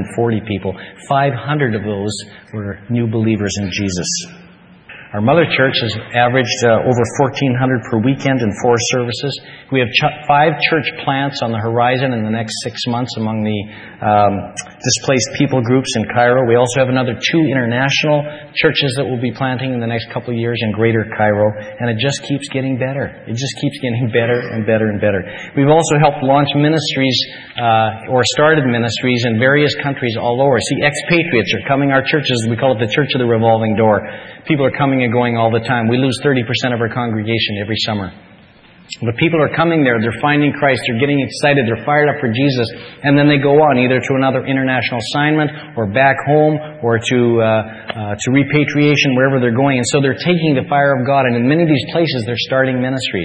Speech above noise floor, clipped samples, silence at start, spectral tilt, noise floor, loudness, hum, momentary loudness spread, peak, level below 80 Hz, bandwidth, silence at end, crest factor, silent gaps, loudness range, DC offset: 29 dB; under 0.1%; 0 s; -5.5 dB/octave; -44 dBFS; -15 LUFS; none; 8 LU; 0 dBFS; -50 dBFS; 10 kHz; 0 s; 14 dB; none; 4 LU; under 0.1%